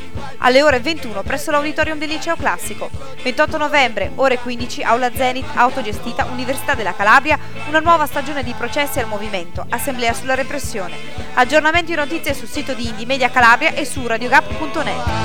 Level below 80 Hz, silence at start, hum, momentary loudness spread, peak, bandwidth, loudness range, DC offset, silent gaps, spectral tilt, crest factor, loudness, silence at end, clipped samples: -38 dBFS; 0 s; none; 12 LU; 0 dBFS; 18 kHz; 3 LU; 6%; none; -3.5 dB/octave; 18 dB; -17 LUFS; 0 s; under 0.1%